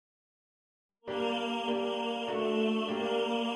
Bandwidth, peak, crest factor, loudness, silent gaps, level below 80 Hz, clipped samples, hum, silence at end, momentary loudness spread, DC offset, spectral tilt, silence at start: 11 kHz; -20 dBFS; 14 dB; -32 LUFS; none; -76 dBFS; under 0.1%; none; 0 s; 4 LU; under 0.1%; -5 dB/octave; 1.05 s